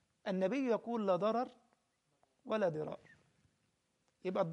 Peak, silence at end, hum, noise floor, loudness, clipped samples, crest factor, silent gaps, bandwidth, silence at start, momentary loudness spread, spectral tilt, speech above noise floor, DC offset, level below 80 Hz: -20 dBFS; 0 s; none; -80 dBFS; -37 LUFS; under 0.1%; 18 dB; none; 9.6 kHz; 0.25 s; 11 LU; -7.5 dB/octave; 44 dB; under 0.1%; -84 dBFS